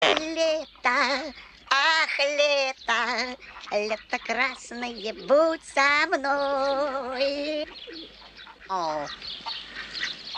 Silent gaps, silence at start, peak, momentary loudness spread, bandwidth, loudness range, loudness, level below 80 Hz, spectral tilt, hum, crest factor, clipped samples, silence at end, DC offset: none; 0 s; -6 dBFS; 15 LU; 10 kHz; 6 LU; -25 LUFS; -60 dBFS; -1.5 dB/octave; none; 20 dB; under 0.1%; 0 s; under 0.1%